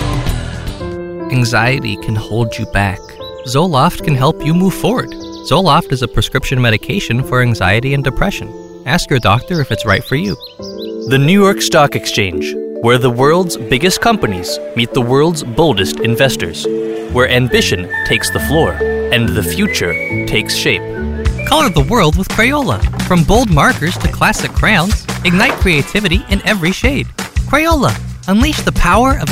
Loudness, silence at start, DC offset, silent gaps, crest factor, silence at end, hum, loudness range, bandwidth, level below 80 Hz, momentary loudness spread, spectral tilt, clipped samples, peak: -13 LUFS; 0 s; 0.3%; none; 14 dB; 0 s; none; 3 LU; 16.5 kHz; -24 dBFS; 9 LU; -5 dB/octave; under 0.1%; 0 dBFS